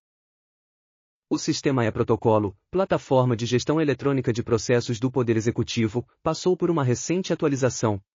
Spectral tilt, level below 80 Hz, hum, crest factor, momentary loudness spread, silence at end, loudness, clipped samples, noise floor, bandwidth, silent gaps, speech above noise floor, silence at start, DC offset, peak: -6 dB/octave; -56 dBFS; none; 16 dB; 5 LU; 0.15 s; -24 LUFS; under 0.1%; under -90 dBFS; 7.4 kHz; none; over 67 dB; 1.3 s; under 0.1%; -8 dBFS